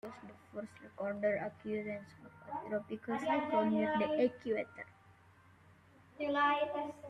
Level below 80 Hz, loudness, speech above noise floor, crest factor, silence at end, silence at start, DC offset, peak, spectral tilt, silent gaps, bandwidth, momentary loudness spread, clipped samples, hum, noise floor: -78 dBFS; -36 LUFS; 27 dB; 16 dB; 0 s; 0.05 s; under 0.1%; -20 dBFS; -6.5 dB/octave; none; 11 kHz; 18 LU; under 0.1%; none; -63 dBFS